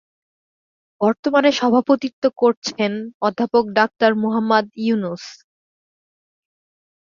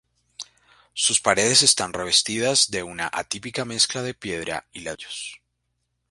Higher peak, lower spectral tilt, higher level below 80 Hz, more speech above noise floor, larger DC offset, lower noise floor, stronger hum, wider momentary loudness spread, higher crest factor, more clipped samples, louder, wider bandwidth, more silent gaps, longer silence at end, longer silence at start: about the same, -2 dBFS vs 0 dBFS; first, -5 dB/octave vs -1 dB/octave; second, -66 dBFS vs -58 dBFS; first, over 72 dB vs 52 dB; neither; first, under -90 dBFS vs -75 dBFS; second, none vs 60 Hz at -55 dBFS; second, 7 LU vs 20 LU; second, 18 dB vs 24 dB; neither; about the same, -19 LUFS vs -20 LUFS; second, 7.4 kHz vs 11.5 kHz; first, 1.19-1.23 s, 2.13-2.22 s, 2.57-2.62 s, 3.14-3.20 s vs none; first, 1.8 s vs 0.75 s; first, 1 s vs 0.4 s